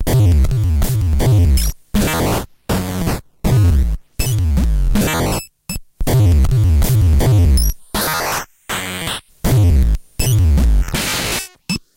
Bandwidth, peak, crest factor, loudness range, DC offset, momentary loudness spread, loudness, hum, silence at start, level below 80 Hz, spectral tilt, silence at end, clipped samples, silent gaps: 17 kHz; -4 dBFS; 10 dB; 2 LU; under 0.1%; 10 LU; -16 LUFS; none; 0 s; -18 dBFS; -5.5 dB/octave; 0.2 s; under 0.1%; none